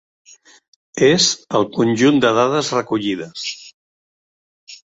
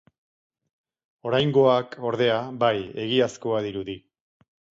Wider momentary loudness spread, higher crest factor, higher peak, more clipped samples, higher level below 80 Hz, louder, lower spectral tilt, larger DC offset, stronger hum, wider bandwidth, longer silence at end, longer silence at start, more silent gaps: about the same, 14 LU vs 14 LU; about the same, 18 dB vs 20 dB; first, -2 dBFS vs -6 dBFS; neither; about the same, -58 dBFS vs -62 dBFS; first, -17 LUFS vs -24 LUFS; second, -4 dB/octave vs -6 dB/octave; neither; neither; about the same, 8 kHz vs 7.8 kHz; second, 0.2 s vs 0.8 s; second, 0.95 s vs 1.25 s; first, 3.74-4.67 s vs none